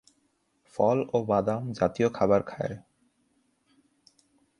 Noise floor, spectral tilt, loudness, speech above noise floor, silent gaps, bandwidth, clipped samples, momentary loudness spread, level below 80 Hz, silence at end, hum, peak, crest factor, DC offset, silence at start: -72 dBFS; -7.5 dB/octave; -27 LUFS; 46 dB; none; 11 kHz; under 0.1%; 11 LU; -60 dBFS; 1.8 s; none; -8 dBFS; 20 dB; under 0.1%; 0.75 s